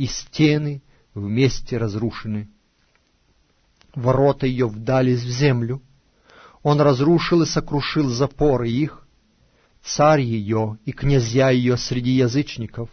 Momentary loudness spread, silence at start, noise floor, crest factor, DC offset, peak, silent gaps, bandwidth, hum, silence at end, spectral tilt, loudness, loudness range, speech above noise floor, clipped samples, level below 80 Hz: 12 LU; 0 s; -62 dBFS; 16 dB; under 0.1%; -4 dBFS; none; 6.6 kHz; none; 0.05 s; -6.5 dB/octave; -20 LUFS; 5 LU; 43 dB; under 0.1%; -40 dBFS